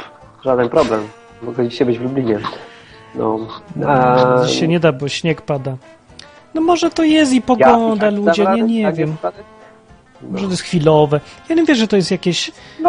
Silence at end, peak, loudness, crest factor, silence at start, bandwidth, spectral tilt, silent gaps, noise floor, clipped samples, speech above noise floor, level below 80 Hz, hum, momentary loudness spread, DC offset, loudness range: 0 s; 0 dBFS; -15 LUFS; 16 dB; 0 s; 10 kHz; -5.5 dB/octave; none; -45 dBFS; under 0.1%; 30 dB; -48 dBFS; none; 14 LU; under 0.1%; 5 LU